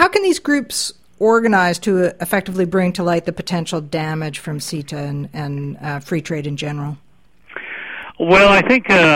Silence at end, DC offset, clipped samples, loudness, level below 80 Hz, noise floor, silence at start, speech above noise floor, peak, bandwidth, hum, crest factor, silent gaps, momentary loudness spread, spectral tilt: 0 s; 0.4%; under 0.1%; -17 LUFS; -46 dBFS; -47 dBFS; 0 s; 30 dB; 0 dBFS; 16.5 kHz; none; 18 dB; none; 16 LU; -5 dB/octave